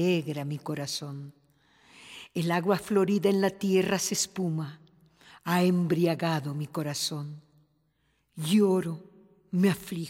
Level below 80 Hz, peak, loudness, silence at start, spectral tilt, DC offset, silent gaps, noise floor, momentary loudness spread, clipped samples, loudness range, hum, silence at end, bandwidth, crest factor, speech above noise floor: -70 dBFS; -10 dBFS; -28 LUFS; 0 s; -5 dB/octave; under 0.1%; none; -72 dBFS; 16 LU; under 0.1%; 3 LU; none; 0 s; 16 kHz; 18 dB; 45 dB